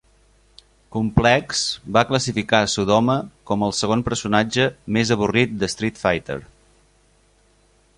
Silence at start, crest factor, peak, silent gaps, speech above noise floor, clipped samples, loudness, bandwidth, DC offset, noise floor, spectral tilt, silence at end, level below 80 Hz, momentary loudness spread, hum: 0.9 s; 20 dB; -2 dBFS; none; 38 dB; under 0.1%; -20 LUFS; 11.5 kHz; under 0.1%; -58 dBFS; -4.5 dB/octave; 1.55 s; -42 dBFS; 7 LU; 50 Hz at -50 dBFS